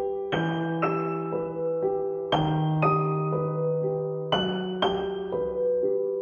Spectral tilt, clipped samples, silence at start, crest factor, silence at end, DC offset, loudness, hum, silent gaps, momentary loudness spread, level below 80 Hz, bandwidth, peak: -8 dB/octave; under 0.1%; 0 s; 18 dB; 0 s; under 0.1%; -27 LUFS; none; none; 6 LU; -56 dBFS; 6.8 kHz; -8 dBFS